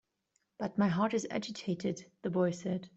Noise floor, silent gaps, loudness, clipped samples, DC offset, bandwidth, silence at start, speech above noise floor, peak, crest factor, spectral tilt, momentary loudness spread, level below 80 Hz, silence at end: -80 dBFS; none; -34 LUFS; under 0.1%; under 0.1%; 8.2 kHz; 0.6 s; 46 dB; -18 dBFS; 16 dB; -6 dB/octave; 8 LU; -72 dBFS; 0.1 s